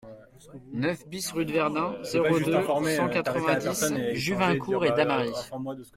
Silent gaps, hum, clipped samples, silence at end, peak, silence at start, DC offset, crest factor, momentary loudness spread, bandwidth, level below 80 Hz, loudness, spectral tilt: none; none; under 0.1%; 0.1 s; -8 dBFS; 0.05 s; under 0.1%; 18 dB; 8 LU; 16.5 kHz; -60 dBFS; -27 LUFS; -5 dB/octave